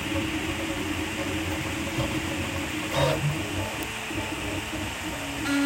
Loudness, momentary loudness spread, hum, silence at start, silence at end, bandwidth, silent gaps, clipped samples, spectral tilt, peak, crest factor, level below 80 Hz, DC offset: -29 LUFS; 6 LU; none; 0 s; 0 s; 16.5 kHz; none; under 0.1%; -4.5 dB/octave; -10 dBFS; 20 dB; -44 dBFS; under 0.1%